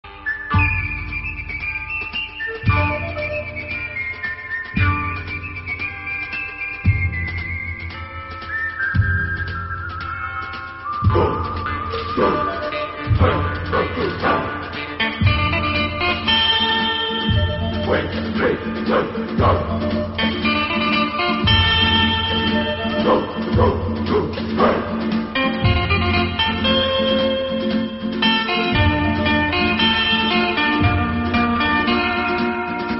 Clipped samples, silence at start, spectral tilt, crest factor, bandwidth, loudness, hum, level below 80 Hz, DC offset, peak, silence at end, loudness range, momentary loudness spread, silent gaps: under 0.1%; 0.05 s; -3 dB/octave; 18 dB; 5.8 kHz; -19 LUFS; none; -36 dBFS; under 0.1%; -2 dBFS; 0 s; 6 LU; 10 LU; none